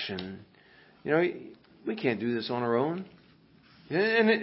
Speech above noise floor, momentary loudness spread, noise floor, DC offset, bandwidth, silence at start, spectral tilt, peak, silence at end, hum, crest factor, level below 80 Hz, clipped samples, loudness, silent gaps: 31 dB; 19 LU; -59 dBFS; under 0.1%; 5.8 kHz; 0 s; -9.5 dB/octave; -12 dBFS; 0 s; none; 20 dB; -68 dBFS; under 0.1%; -29 LUFS; none